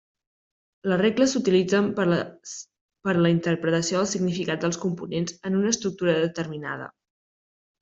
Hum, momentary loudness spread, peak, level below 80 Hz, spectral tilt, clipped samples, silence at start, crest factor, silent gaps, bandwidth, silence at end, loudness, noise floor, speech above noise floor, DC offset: none; 13 LU; -8 dBFS; -64 dBFS; -5 dB/octave; under 0.1%; 0.85 s; 18 dB; 2.81-2.89 s; 8 kHz; 0.9 s; -24 LUFS; under -90 dBFS; over 66 dB; under 0.1%